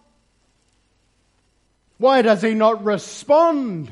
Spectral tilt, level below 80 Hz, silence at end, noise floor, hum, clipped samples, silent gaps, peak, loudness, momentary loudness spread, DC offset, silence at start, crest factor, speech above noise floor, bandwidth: -5.5 dB/octave; -66 dBFS; 0.05 s; -64 dBFS; none; under 0.1%; none; -2 dBFS; -17 LUFS; 8 LU; under 0.1%; 2 s; 18 dB; 47 dB; 11.5 kHz